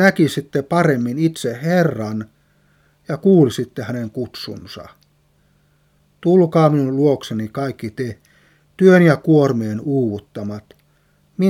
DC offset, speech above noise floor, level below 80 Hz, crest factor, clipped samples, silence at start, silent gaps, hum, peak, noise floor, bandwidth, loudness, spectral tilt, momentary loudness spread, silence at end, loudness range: under 0.1%; 42 dB; -60 dBFS; 18 dB; under 0.1%; 0 s; none; none; 0 dBFS; -58 dBFS; 16 kHz; -17 LUFS; -7.5 dB/octave; 17 LU; 0 s; 5 LU